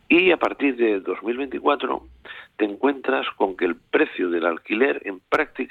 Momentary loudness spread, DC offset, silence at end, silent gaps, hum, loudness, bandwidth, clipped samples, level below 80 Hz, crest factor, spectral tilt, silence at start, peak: 8 LU; under 0.1%; 0.05 s; none; none; -22 LUFS; 6.8 kHz; under 0.1%; -58 dBFS; 16 dB; -6 dB/octave; 0.1 s; -6 dBFS